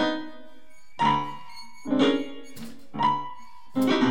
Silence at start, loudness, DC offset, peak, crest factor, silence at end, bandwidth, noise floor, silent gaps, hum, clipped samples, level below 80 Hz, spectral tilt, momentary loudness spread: 0 s; -26 LUFS; 1%; -8 dBFS; 18 dB; 0 s; 18 kHz; -56 dBFS; none; none; under 0.1%; -62 dBFS; -5.5 dB/octave; 20 LU